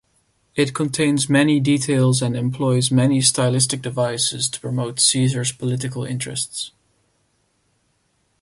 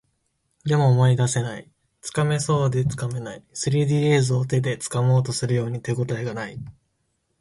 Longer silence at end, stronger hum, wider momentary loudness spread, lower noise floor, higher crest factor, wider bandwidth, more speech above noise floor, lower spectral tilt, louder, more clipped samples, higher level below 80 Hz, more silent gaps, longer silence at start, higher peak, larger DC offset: first, 1.75 s vs 0.7 s; neither; second, 9 LU vs 14 LU; second, -66 dBFS vs -72 dBFS; about the same, 18 dB vs 16 dB; about the same, 11.5 kHz vs 11.5 kHz; about the same, 47 dB vs 50 dB; second, -4.5 dB/octave vs -6 dB/octave; first, -19 LUFS vs -22 LUFS; neither; about the same, -56 dBFS vs -54 dBFS; neither; about the same, 0.55 s vs 0.65 s; first, -2 dBFS vs -8 dBFS; neither